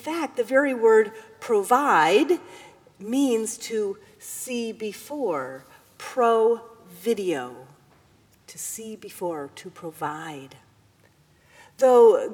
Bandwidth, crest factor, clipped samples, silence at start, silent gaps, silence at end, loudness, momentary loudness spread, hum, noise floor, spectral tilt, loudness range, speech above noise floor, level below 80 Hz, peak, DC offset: 19 kHz; 18 dB; under 0.1%; 0.05 s; none; 0 s; -23 LUFS; 20 LU; none; -59 dBFS; -3.5 dB/octave; 13 LU; 36 dB; -74 dBFS; -6 dBFS; under 0.1%